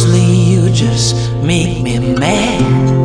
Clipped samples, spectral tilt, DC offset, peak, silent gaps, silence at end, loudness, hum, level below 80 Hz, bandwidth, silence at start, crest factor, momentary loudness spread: under 0.1%; -5.5 dB/octave; under 0.1%; 0 dBFS; none; 0 s; -12 LUFS; none; -30 dBFS; 10 kHz; 0 s; 10 dB; 5 LU